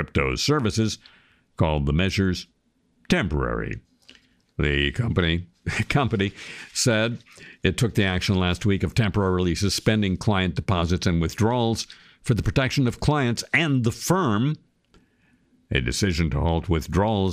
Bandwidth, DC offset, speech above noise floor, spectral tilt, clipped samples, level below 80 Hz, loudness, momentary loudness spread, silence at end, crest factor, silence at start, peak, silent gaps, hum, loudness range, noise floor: 15.5 kHz; under 0.1%; 43 dB; -5.5 dB/octave; under 0.1%; -38 dBFS; -23 LUFS; 6 LU; 0 s; 18 dB; 0 s; -6 dBFS; none; none; 3 LU; -66 dBFS